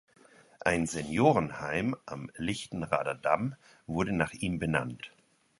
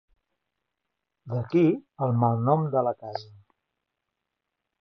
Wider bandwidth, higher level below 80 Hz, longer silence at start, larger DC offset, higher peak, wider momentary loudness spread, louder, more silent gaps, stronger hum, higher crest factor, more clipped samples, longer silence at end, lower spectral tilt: first, 11.5 kHz vs 6.2 kHz; first, -54 dBFS vs -66 dBFS; second, 0.65 s vs 1.25 s; neither; about the same, -10 dBFS vs -8 dBFS; about the same, 14 LU vs 13 LU; second, -31 LUFS vs -25 LUFS; neither; neither; about the same, 22 dB vs 20 dB; neither; second, 0.5 s vs 1.6 s; second, -5.5 dB/octave vs -10.5 dB/octave